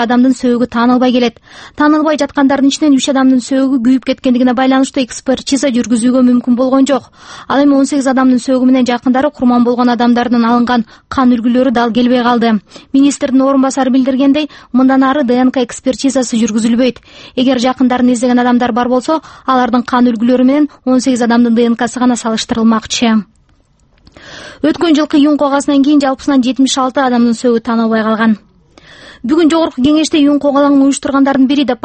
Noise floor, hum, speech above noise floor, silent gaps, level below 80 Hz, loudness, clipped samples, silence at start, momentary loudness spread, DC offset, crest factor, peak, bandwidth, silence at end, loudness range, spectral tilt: -51 dBFS; none; 40 dB; none; -46 dBFS; -11 LUFS; under 0.1%; 0 s; 5 LU; under 0.1%; 10 dB; 0 dBFS; 8.8 kHz; 0.1 s; 2 LU; -4.5 dB/octave